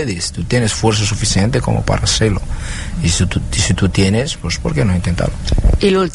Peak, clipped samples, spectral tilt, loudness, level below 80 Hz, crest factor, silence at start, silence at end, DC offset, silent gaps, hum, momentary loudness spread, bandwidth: 0 dBFS; under 0.1%; -4.5 dB/octave; -16 LUFS; -22 dBFS; 14 dB; 0 s; 0 s; under 0.1%; none; none; 6 LU; 11.5 kHz